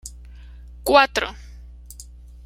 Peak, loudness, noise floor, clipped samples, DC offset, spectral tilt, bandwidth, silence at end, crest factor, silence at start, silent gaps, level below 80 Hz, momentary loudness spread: -2 dBFS; -19 LUFS; -42 dBFS; under 0.1%; under 0.1%; -3 dB/octave; 16 kHz; 0.45 s; 22 dB; 0.05 s; none; -40 dBFS; 26 LU